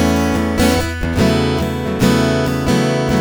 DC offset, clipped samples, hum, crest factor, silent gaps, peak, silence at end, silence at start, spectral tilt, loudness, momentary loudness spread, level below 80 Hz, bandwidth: under 0.1%; under 0.1%; none; 14 dB; none; 0 dBFS; 0 s; 0 s; -5.5 dB/octave; -16 LUFS; 4 LU; -28 dBFS; over 20 kHz